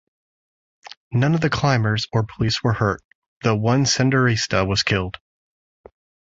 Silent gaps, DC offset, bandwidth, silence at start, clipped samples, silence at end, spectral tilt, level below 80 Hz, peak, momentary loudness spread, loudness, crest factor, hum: 0.97-1.11 s, 3.04-3.41 s; under 0.1%; 8 kHz; 0.85 s; under 0.1%; 1.15 s; -5 dB/octave; -44 dBFS; -2 dBFS; 8 LU; -20 LUFS; 20 dB; none